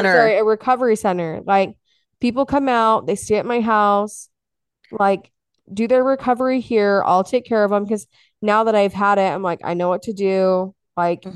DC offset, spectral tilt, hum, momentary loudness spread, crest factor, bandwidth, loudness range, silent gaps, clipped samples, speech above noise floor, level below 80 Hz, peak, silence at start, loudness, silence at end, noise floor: under 0.1%; -5.5 dB/octave; none; 9 LU; 18 dB; 12.5 kHz; 2 LU; none; under 0.1%; 65 dB; -56 dBFS; 0 dBFS; 0 s; -18 LUFS; 0.05 s; -82 dBFS